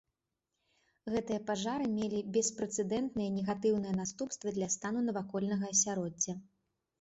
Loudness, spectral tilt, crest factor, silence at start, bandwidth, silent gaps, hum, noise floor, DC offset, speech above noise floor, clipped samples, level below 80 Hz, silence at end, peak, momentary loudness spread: -34 LUFS; -6 dB/octave; 18 dB; 1.05 s; 8 kHz; none; none; -87 dBFS; under 0.1%; 53 dB; under 0.1%; -68 dBFS; 0.6 s; -18 dBFS; 7 LU